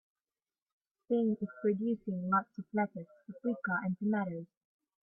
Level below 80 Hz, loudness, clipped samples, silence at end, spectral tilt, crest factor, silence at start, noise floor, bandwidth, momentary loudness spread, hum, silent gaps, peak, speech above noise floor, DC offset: -78 dBFS; -35 LUFS; under 0.1%; 0.6 s; -11 dB/octave; 18 dB; 1.1 s; under -90 dBFS; 3.5 kHz; 11 LU; none; none; -18 dBFS; over 56 dB; under 0.1%